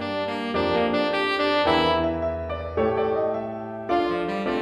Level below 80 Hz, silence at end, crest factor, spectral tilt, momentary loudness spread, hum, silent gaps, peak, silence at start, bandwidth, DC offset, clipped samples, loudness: -46 dBFS; 0 s; 16 dB; -6.5 dB/octave; 8 LU; none; none; -8 dBFS; 0 s; 12.5 kHz; under 0.1%; under 0.1%; -24 LUFS